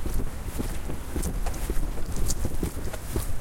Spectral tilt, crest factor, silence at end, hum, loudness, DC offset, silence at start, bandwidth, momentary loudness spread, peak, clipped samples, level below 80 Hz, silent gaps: -5 dB/octave; 16 dB; 0 s; none; -33 LUFS; under 0.1%; 0 s; 17 kHz; 4 LU; -10 dBFS; under 0.1%; -30 dBFS; none